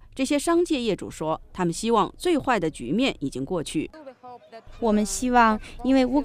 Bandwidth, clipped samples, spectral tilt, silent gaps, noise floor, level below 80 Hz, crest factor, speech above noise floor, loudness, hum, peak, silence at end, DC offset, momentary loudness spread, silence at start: 15.5 kHz; under 0.1%; -4.5 dB/octave; none; -44 dBFS; -44 dBFS; 18 dB; 20 dB; -24 LUFS; none; -6 dBFS; 0 s; under 0.1%; 10 LU; 0.15 s